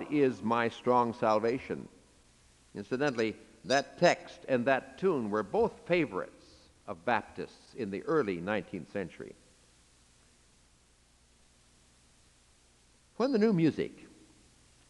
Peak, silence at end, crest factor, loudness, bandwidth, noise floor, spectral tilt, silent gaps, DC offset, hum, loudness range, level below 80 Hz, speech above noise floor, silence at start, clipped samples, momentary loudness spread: -10 dBFS; 0.85 s; 24 dB; -31 LUFS; 11.5 kHz; -65 dBFS; -6 dB/octave; none; under 0.1%; 60 Hz at -65 dBFS; 8 LU; -68 dBFS; 34 dB; 0 s; under 0.1%; 17 LU